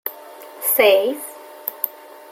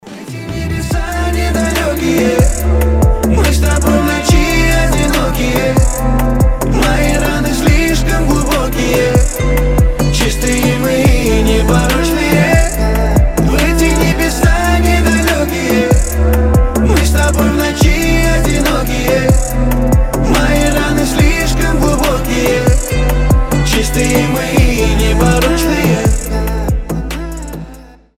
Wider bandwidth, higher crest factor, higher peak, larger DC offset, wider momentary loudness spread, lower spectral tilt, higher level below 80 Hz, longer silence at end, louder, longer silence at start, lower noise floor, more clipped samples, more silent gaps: about the same, 17 kHz vs 16.5 kHz; first, 22 dB vs 12 dB; about the same, 0 dBFS vs 0 dBFS; neither; first, 21 LU vs 4 LU; second, -0.5 dB/octave vs -5 dB/octave; second, -72 dBFS vs -14 dBFS; about the same, 0.4 s vs 0.3 s; second, -19 LUFS vs -12 LUFS; about the same, 0.05 s vs 0.05 s; first, -39 dBFS vs -35 dBFS; neither; neither